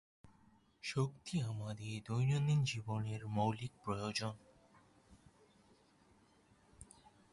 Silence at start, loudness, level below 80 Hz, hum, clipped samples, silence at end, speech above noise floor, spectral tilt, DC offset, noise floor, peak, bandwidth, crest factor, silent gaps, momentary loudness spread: 0.25 s; -39 LUFS; -68 dBFS; none; under 0.1%; 0.5 s; 31 dB; -6 dB/octave; under 0.1%; -69 dBFS; -22 dBFS; 11.5 kHz; 18 dB; none; 20 LU